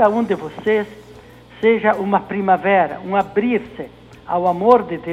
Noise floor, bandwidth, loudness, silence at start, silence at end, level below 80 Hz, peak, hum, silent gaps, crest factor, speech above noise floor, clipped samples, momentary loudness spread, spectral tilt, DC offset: -42 dBFS; 9.4 kHz; -18 LUFS; 0 s; 0 s; -52 dBFS; 0 dBFS; none; none; 18 dB; 24 dB; under 0.1%; 9 LU; -7.5 dB/octave; under 0.1%